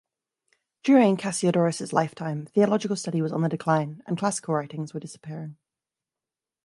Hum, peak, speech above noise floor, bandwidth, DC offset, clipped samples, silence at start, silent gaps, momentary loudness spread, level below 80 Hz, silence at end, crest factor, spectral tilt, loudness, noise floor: none; -6 dBFS; 66 dB; 11.5 kHz; under 0.1%; under 0.1%; 0.85 s; none; 17 LU; -72 dBFS; 1.15 s; 20 dB; -6 dB/octave; -25 LUFS; -90 dBFS